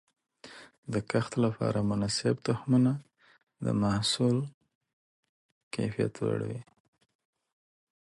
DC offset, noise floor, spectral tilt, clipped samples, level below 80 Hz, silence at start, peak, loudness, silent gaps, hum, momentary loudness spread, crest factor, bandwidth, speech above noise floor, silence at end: under 0.1%; -52 dBFS; -6 dB/octave; under 0.1%; -60 dBFS; 0.45 s; -14 dBFS; -30 LUFS; 0.78-0.83 s, 4.54-4.61 s, 4.75-4.81 s, 4.93-5.23 s, 5.29-5.71 s; none; 15 LU; 18 dB; 11.5 kHz; 23 dB; 1.4 s